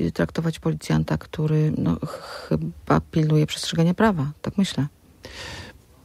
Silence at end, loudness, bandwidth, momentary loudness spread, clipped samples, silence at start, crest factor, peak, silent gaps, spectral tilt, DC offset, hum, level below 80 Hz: 0.35 s; -23 LUFS; 14 kHz; 15 LU; under 0.1%; 0 s; 18 dB; -6 dBFS; none; -6.5 dB/octave; under 0.1%; none; -44 dBFS